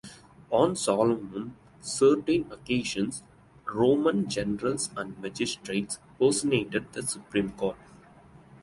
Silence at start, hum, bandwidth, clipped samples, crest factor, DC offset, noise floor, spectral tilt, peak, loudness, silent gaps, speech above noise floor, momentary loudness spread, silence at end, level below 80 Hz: 0.05 s; none; 11.5 kHz; under 0.1%; 20 dB; under 0.1%; -53 dBFS; -4.5 dB/octave; -8 dBFS; -28 LUFS; none; 26 dB; 14 LU; 0.05 s; -58 dBFS